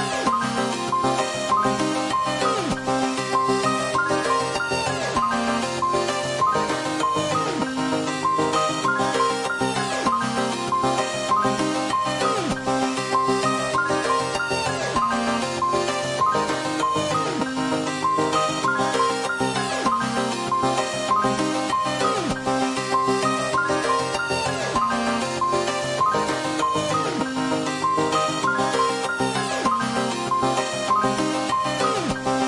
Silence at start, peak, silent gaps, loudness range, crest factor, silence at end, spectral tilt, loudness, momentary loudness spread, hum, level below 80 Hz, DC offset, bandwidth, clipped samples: 0 s; -8 dBFS; none; 1 LU; 14 dB; 0 s; -3.5 dB/octave; -22 LUFS; 3 LU; none; -52 dBFS; under 0.1%; 11.5 kHz; under 0.1%